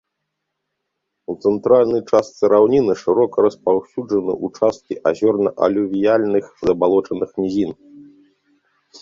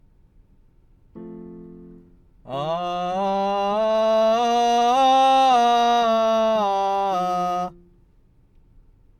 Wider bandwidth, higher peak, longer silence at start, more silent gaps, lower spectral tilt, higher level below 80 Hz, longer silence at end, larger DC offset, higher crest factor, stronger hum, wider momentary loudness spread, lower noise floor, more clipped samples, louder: second, 7.6 kHz vs 13.5 kHz; first, -2 dBFS vs -6 dBFS; first, 1.3 s vs 1.15 s; neither; first, -7 dB/octave vs -4.5 dB/octave; about the same, -56 dBFS vs -54 dBFS; second, 1 s vs 1.5 s; neither; about the same, 18 dB vs 14 dB; neither; second, 8 LU vs 17 LU; first, -77 dBFS vs -56 dBFS; neither; about the same, -18 LUFS vs -20 LUFS